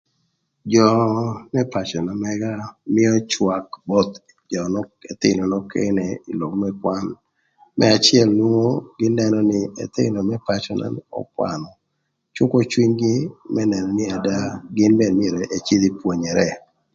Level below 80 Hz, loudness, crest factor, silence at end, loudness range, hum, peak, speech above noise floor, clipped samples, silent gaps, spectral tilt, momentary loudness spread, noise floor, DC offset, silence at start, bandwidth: -54 dBFS; -20 LUFS; 20 dB; 0.35 s; 5 LU; none; 0 dBFS; 54 dB; under 0.1%; none; -5.5 dB/octave; 11 LU; -73 dBFS; under 0.1%; 0.65 s; 7.8 kHz